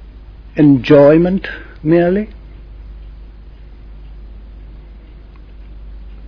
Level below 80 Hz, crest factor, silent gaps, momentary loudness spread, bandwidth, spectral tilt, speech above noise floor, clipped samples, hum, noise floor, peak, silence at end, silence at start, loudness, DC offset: -34 dBFS; 16 dB; none; 28 LU; 5.4 kHz; -9.5 dB/octave; 25 dB; under 0.1%; none; -36 dBFS; 0 dBFS; 0 s; 0 s; -12 LUFS; under 0.1%